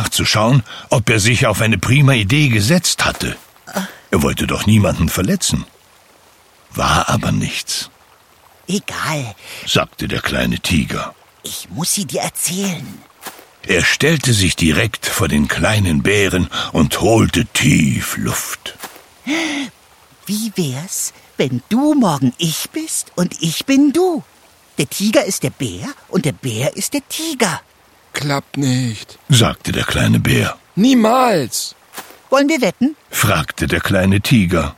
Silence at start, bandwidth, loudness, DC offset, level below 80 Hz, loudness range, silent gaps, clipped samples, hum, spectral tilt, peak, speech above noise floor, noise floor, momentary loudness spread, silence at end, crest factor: 0 s; 17 kHz; -16 LUFS; under 0.1%; -36 dBFS; 6 LU; none; under 0.1%; none; -4.5 dB/octave; 0 dBFS; 33 dB; -49 dBFS; 14 LU; 0.05 s; 16 dB